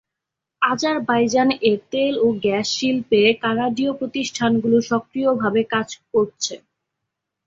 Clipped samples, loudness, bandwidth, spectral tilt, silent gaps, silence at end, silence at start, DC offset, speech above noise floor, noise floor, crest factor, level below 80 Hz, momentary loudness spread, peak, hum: under 0.1%; -20 LUFS; 7.8 kHz; -4 dB/octave; none; 0.9 s; 0.6 s; under 0.1%; 64 dB; -84 dBFS; 18 dB; -60 dBFS; 7 LU; -4 dBFS; none